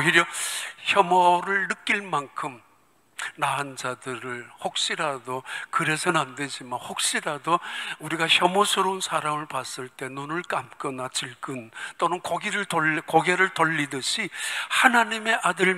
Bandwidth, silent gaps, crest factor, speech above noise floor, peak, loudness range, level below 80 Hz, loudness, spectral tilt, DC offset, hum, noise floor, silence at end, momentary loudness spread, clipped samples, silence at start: 16 kHz; none; 24 dB; 37 dB; -2 dBFS; 7 LU; -74 dBFS; -24 LUFS; -2.5 dB/octave; under 0.1%; none; -62 dBFS; 0 s; 14 LU; under 0.1%; 0 s